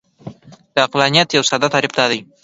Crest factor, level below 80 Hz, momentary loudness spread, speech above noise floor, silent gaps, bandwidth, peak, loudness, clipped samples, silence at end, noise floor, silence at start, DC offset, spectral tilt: 18 dB; -58 dBFS; 5 LU; 21 dB; none; 10.5 kHz; 0 dBFS; -15 LUFS; under 0.1%; 0.2 s; -37 dBFS; 0.25 s; under 0.1%; -3 dB/octave